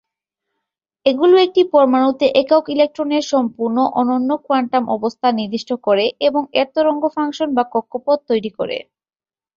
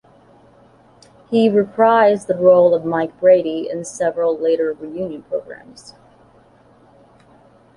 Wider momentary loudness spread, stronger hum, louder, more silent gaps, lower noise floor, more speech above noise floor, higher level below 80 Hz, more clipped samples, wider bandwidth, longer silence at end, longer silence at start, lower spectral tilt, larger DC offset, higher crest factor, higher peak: second, 8 LU vs 15 LU; neither; about the same, -17 LUFS vs -17 LUFS; neither; first, -80 dBFS vs -50 dBFS; first, 64 dB vs 34 dB; about the same, -62 dBFS vs -60 dBFS; neither; second, 7.4 kHz vs 11 kHz; second, 0.75 s vs 2.2 s; second, 1.05 s vs 1.3 s; about the same, -5 dB/octave vs -6 dB/octave; neither; about the same, 16 dB vs 16 dB; about the same, -2 dBFS vs -2 dBFS